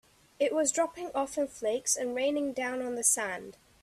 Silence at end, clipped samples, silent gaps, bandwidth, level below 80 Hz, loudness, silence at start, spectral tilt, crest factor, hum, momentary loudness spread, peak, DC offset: 0.3 s; under 0.1%; none; 15 kHz; -68 dBFS; -30 LUFS; 0.4 s; -1.5 dB/octave; 20 dB; none; 8 LU; -10 dBFS; under 0.1%